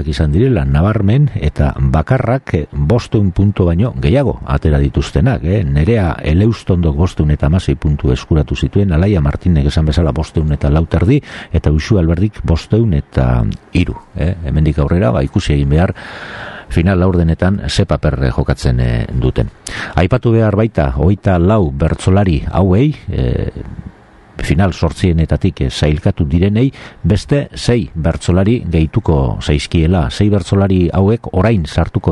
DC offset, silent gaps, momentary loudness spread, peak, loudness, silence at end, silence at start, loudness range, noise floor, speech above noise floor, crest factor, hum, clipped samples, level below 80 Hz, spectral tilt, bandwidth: under 0.1%; none; 5 LU; 0 dBFS; -14 LUFS; 0 s; 0 s; 2 LU; -40 dBFS; 27 dB; 12 dB; none; under 0.1%; -22 dBFS; -7.5 dB/octave; 11.5 kHz